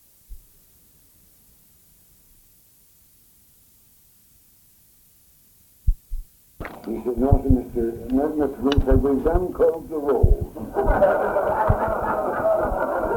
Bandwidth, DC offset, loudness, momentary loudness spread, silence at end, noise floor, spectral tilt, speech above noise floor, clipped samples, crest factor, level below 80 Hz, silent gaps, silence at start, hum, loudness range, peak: 18 kHz; under 0.1%; -22 LUFS; 11 LU; 0 s; -55 dBFS; -8 dB/octave; 35 dB; under 0.1%; 20 dB; -30 dBFS; none; 0.3 s; none; 17 LU; -4 dBFS